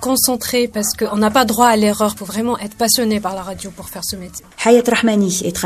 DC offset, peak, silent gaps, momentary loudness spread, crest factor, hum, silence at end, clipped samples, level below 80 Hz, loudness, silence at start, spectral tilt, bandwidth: under 0.1%; 0 dBFS; none; 14 LU; 16 dB; none; 0 s; under 0.1%; -46 dBFS; -16 LUFS; 0 s; -3.5 dB/octave; 16 kHz